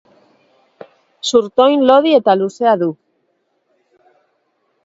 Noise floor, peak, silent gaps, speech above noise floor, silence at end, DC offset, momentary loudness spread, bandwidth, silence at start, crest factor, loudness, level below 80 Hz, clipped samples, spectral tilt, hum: -65 dBFS; 0 dBFS; none; 53 dB; 1.9 s; under 0.1%; 8 LU; 8 kHz; 1.25 s; 16 dB; -13 LUFS; -64 dBFS; under 0.1%; -4.5 dB/octave; none